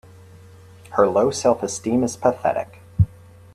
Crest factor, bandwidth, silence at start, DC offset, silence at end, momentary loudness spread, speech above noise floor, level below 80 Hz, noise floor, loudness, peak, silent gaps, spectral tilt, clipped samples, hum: 20 dB; 13.5 kHz; 0.9 s; under 0.1%; 0.5 s; 8 LU; 25 dB; -44 dBFS; -45 dBFS; -21 LUFS; -2 dBFS; none; -6 dB/octave; under 0.1%; none